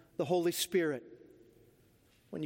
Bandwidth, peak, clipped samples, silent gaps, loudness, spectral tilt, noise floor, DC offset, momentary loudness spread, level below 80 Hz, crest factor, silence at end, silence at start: 16.5 kHz; -18 dBFS; under 0.1%; none; -33 LUFS; -4 dB/octave; -67 dBFS; under 0.1%; 12 LU; -76 dBFS; 18 dB; 0 s; 0.2 s